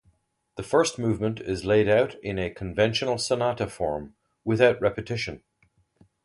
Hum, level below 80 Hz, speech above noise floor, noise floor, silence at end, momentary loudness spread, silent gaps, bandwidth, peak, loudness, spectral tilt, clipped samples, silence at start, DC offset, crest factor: none; -50 dBFS; 42 dB; -67 dBFS; 0.9 s; 13 LU; none; 11.5 kHz; -6 dBFS; -25 LUFS; -5 dB/octave; under 0.1%; 0.55 s; under 0.1%; 20 dB